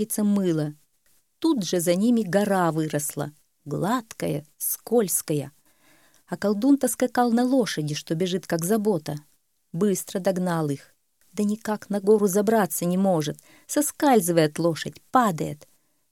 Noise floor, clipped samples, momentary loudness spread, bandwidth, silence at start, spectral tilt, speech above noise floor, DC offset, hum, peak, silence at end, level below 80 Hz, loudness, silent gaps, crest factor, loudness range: -66 dBFS; under 0.1%; 12 LU; 17.5 kHz; 0 s; -5 dB/octave; 43 dB; under 0.1%; none; -4 dBFS; 0.55 s; -68 dBFS; -24 LUFS; none; 20 dB; 4 LU